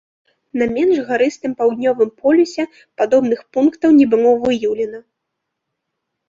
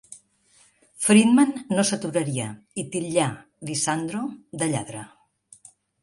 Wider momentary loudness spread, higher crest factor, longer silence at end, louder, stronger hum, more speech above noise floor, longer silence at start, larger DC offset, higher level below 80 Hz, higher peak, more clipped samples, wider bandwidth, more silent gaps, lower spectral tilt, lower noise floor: second, 10 LU vs 16 LU; second, 14 dB vs 20 dB; first, 1.3 s vs 0.95 s; first, -16 LUFS vs -23 LUFS; neither; first, 62 dB vs 37 dB; first, 0.55 s vs 0.1 s; neither; first, -56 dBFS vs -66 dBFS; about the same, -2 dBFS vs -4 dBFS; neither; second, 7.6 kHz vs 11.5 kHz; neither; about the same, -5.5 dB/octave vs -4.5 dB/octave; first, -77 dBFS vs -60 dBFS